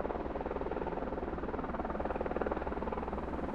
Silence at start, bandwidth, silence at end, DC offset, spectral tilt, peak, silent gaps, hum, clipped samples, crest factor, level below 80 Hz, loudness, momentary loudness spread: 0 s; 8 kHz; 0 s; under 0.1%; -9 dB/octave; -16 dBFS; none; none; under 0.1%; 20 dB; -46 dBFS; -38 LUFS; 3 LU